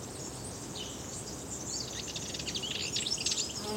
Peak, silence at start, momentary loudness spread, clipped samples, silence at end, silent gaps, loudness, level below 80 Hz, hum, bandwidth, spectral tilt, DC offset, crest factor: -16 dBFS; 0 s; 10 LU; under 0.1%; 0 s; none; -35 LUFS; -56 dBFS; none; 16.5 kHz; -2 dB/octave; under 0.1%; 20 dB